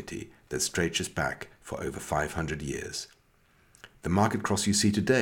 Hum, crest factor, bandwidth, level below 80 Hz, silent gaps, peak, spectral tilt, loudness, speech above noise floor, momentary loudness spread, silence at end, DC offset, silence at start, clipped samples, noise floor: none; 20 dB; 18 kHz; -50 dBFS; none; -10 dBFS; -4 dB/octave; -29 LUFS; 35 dB; 15 LU; 0 s; under 0.1%; 0 s; under 0.1%; -64 dBFS